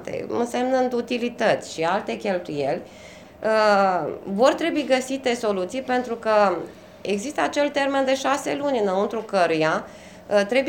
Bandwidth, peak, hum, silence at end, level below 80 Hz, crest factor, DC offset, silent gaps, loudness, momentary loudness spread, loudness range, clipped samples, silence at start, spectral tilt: 17 kHz; -4 dBFS; none; 0 s; -60 dBFS; 18 dB; under 0.1%; none; -23 LUFS; 9 LU; 2 LU; under 0.1%; 0 s; -4.5 dB/octave